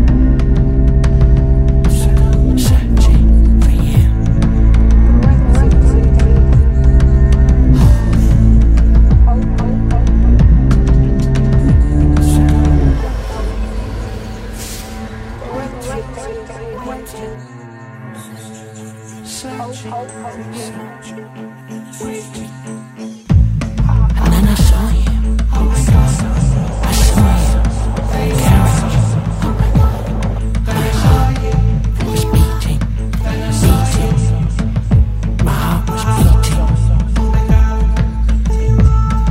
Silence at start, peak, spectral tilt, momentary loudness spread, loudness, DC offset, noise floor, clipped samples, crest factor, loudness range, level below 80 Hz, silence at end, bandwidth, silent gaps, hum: 0 s; 0 dBFS; -7 dB/octave; 17 LU; -13 LUFS; under 0.1%; -32 dBFS; under 0.1%; 12 dB; 17 LU; -12 dBFS; 0 s; 15.5 kHz; none; none